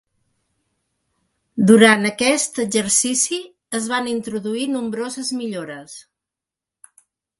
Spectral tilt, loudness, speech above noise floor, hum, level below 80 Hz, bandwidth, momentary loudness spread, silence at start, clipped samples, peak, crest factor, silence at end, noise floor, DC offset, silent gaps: -3 dB/octave; -18 LUFS; 69 dB; none; -62 dBFS; 11.5 kHz; 17 LU; 1.55 s; under 0.1%; 0 dBFS; 20 dB; 1.4 s; -87 dBFS; under 0.1%; none